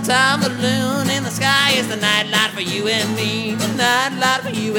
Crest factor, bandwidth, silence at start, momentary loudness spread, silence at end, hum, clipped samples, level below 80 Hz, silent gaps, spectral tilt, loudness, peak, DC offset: 16 dB; over 20 kHz; 0 s; 6 LU; 0 s; none; under 0.1%; -60 dBFS; none; -3 dB/octave; -17 LUFS; -2 dBFS; under 0.1%